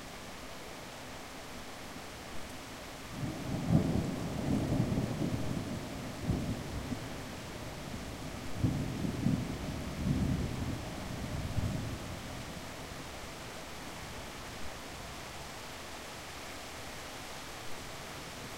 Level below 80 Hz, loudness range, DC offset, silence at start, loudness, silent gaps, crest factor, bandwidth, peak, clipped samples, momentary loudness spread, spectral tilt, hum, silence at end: -48 dBFS; 9 LU; 0.2%; 0 s; -39 LUFS; none; 24 dB; 16 kHz; -14 dBFS; under 0.1%; 12 LU; -5.5 dB/octave; none; 0 s